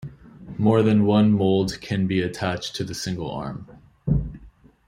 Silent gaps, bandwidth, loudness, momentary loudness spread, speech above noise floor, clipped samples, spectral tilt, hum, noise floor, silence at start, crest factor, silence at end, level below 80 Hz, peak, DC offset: none; 12.5 kHz; -22 LUFS; 16 LU; 28 dB; under 0.1%; -6.5 dB/octave; none; -49 dBFS; 0 s; 16 dB; 0.4 s; -42 dBFS; -6 dBFS; under 0.1%